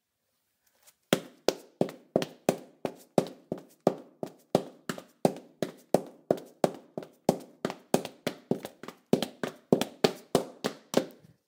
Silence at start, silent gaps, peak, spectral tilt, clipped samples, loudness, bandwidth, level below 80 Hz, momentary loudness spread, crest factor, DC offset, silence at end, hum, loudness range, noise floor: 1.1 s; none; -4 dBFS; -5 dB/octave; under 0.1%; -32 LUFS; 17.5 kHz; -68 dBFS; 11 LU; 28 dB; under 0.1%; 0.4 s; none; 2 LU; -79 dBFS